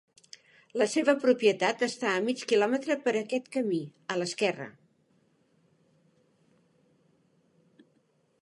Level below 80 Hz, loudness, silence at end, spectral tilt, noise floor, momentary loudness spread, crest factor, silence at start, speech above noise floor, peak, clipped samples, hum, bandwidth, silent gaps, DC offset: -86 dBFS; -28 LUFS; 3.7 s; -4 dB/octave; -70 dBFS; 9 LU; 20 dB; 0.75 s; 42 dB; -10 dBFS; under 0.1%; none; 11.5 kHz; none; under 0.1%